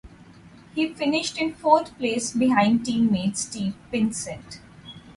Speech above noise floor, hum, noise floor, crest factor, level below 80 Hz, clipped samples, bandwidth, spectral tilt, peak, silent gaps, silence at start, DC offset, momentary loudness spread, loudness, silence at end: 25 dB; none; -48 dBFS; 20 dB; -56 dBFS; under 0.1%; 11.5 kHz; -4.5 dB/octave; -4 dBFS; none; 0.05 s; under 0.1%; 17 LU; -24 LUFS; 0.05 s